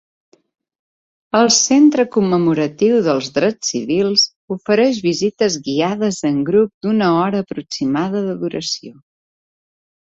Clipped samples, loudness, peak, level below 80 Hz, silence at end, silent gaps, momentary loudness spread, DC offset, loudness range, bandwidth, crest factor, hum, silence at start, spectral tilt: under 0.1%; -16 LUFS; -2 dBFS; -58 dBFS; 1.15 s; 4.36-4.48 s, 6.74-6.81 s; 10 LU; under 0.1%; 4 LU; 8 kHz; 16 dB; none; 1.35 s; -4 dB/octave